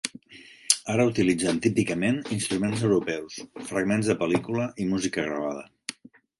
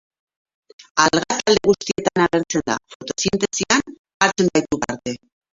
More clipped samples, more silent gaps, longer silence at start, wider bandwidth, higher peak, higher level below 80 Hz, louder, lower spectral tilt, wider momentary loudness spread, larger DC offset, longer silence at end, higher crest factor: neither; second, none vs 0.91-0.95 s, 2.95-3.00 s, 3.99-4.04 s, 4.14-4.20 s; second, 0.05 s vs 0.8 s; first, 12 kHz vs 7.8 kHz; about the same, -2 dBFS vs 0 dBFS; second, -58 dBFS vs -52 dBFS; second, -26 LUFS vs -19 LUFS; about the same, -4.5 dB/octave vs -3.5 dB/octave; first, 14 LU vs 11 LU; neither; about the same, 0.45 s vs 0.4 s; about the same, 24 dB vs 20 dB